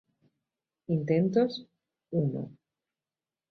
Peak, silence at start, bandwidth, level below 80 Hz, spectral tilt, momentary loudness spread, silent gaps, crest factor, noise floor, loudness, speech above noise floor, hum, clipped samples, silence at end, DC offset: -14 dBFS; 0.9 s; 6.4 kHz; -70 dBFS; -9 dB/octave; 17 LU; none; 18 dB; under -90 dBFS; -29 LUFS; over 62 dB; none; under 0.1%; 1 s; under 0.1%